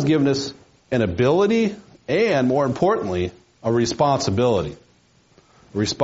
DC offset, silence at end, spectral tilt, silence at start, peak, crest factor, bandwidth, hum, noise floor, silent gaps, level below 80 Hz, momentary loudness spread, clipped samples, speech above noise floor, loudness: under 0.1%; 0 s; -5.5 dB/octave; 0 s; -6 dBFS; 16 dB; 8 kHz; none; -57 dBFS; none; -52 dBFS; 11 LU; under 0.1%; 38 dB; -21 LUFS